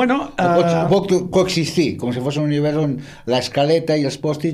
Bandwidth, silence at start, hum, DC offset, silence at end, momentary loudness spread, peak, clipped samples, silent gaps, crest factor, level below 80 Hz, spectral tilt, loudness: 14.5 kHz; 0 s; none; under 0.1%; 0 s; 6 LU; -4 dBFS; under 0.1%; none; 14 dB; -50 dBFS; -6 dB/octave; -18 LUFS